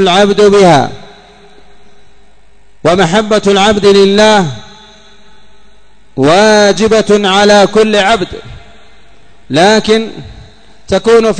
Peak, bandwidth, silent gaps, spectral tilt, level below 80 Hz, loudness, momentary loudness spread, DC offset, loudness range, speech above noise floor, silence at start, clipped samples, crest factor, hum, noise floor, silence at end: 0 dBFS; 11 kHz; none; -4.5 dB/octave; -38 dBFS; -8 LUFS; 13 LU; 2%; 4 LU; 40 dB; 0 s; 1%; 10 dB; none; -47 dBFS; 0 s